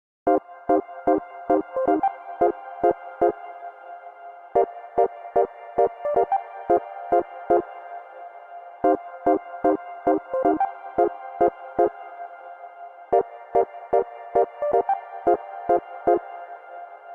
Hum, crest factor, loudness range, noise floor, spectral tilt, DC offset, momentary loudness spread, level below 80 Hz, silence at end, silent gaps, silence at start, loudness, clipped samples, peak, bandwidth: none; 18 dB; 2 LU; -42 dBFS; -8.5 dB/octave; under 0.1%; 17 LU; -58 dBFS; 0 s; none; 0.25 s; -24 LUFS; under 0.1%; -6 dBFS; 3.7 kHz